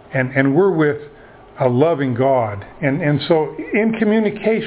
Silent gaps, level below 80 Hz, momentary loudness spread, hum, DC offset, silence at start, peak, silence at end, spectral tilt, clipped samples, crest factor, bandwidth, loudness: none; -52 dBFS; 6 LU; none; under 0.1%; 0.1 s; 0 dBFS; 0 s; -11 dB/octave; under 0.1%; 16 dB; 4 kHz; -17 LUFS